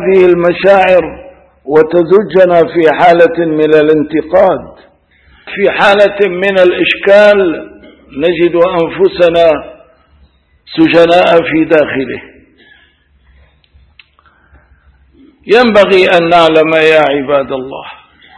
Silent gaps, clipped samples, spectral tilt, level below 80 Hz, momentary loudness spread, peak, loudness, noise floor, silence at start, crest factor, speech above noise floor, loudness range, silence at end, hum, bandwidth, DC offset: none; 1%; -6.5 dB/octave; -44 dBFS; 12 LU; 0 dBFS; -8 LUFS; -49 dBFS; 0 s; 10 dB; 41 dB; 5 LU; 0.45 s; none; 11 kHz; under 0.1%